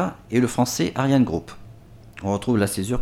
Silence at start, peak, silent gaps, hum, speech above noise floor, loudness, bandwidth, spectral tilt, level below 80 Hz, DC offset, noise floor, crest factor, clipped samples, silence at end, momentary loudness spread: 0 s; -6 dBFS; none; none; 23 dB; -22 LUFS; 16.5 kHz; -5.5 dB/octave; -50 dBFS; under 0.1%; -45 dBFS; 16 dB; under 0.1%; 0 s; 10 LU